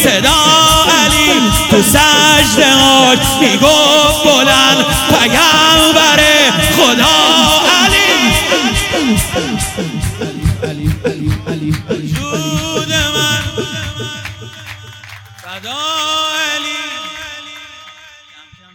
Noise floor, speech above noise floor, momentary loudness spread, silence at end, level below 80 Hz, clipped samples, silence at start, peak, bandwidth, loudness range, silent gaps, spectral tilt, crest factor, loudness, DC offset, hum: -41 dBFS; 33 dB; 16 LU; 0.8 s; -28 dBFS; 0.9%; 0 s; 0 dBFS; over 20 kHz; 12 LU; none; -2.5 dB/octave; 12 dB; -9 LUFS; under 0.1%; none